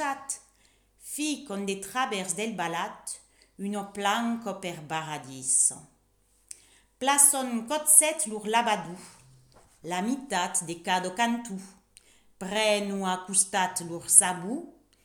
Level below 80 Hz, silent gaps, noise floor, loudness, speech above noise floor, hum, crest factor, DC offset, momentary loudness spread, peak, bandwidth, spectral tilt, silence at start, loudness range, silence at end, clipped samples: -70 dBFS; none; -66 dBFS; -25 LUFS; 39 dB; none; 28 dB; under 0.1%; 19 LU; -2 dBFS; over 20 kHz; -1.5 dB/octave; 0 s; 9 LU; 0.35 s; under 0.1%